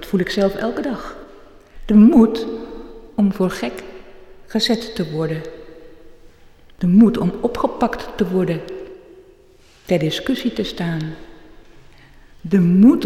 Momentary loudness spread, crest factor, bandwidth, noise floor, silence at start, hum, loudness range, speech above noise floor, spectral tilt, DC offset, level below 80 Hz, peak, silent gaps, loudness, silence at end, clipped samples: 23 LU; 16 dB; 14 kHz; -49 dBFS; 0 s; none; 7 LU; 33 dB; -7 dB/octave; under 0.1%; -42 dBFS; -4 dBFS; none; -18 LUFS; 0 s; under 0.1%